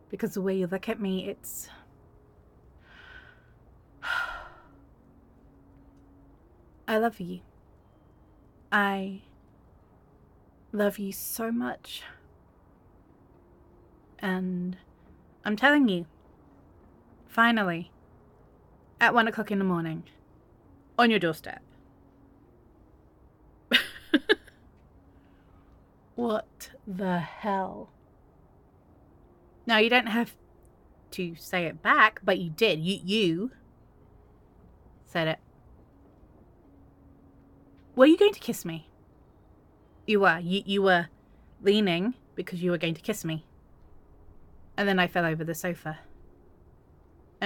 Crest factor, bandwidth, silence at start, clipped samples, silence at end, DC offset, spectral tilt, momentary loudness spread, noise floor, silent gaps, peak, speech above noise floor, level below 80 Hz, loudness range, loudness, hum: 26 dB; 17.5 kHz; 0.1 s; under 0.1%; 0 s; under 0.1%; -5 dB/octave; 19 LU; -58 dBFS; none; -4 dBFS; 32 dB; -60 dBFS; 12 LU; -27 LUFS; none